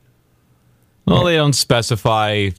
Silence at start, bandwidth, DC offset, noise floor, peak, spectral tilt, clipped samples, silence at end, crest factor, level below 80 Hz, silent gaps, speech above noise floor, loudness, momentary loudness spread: 1.05 s; 16 kHz; under 0.1%; -57 dBFS; -2 dBFS; -4.5 dB/octave; under 0.1%; 0.05 s; 14 dB; -42 dBFS; none; 41 dB; -16 LUFS; 3 LU